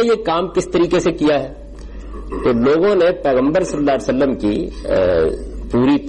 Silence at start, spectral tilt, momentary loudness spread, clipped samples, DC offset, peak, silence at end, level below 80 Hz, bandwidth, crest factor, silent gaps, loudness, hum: 0 s; -6 dB/octave; 15 LU; under 0.1%; under 0.1%; -8 dBFS; 0 s; -34 dBFS; 11 kHz; 10 dB; none; -16 LUFS; none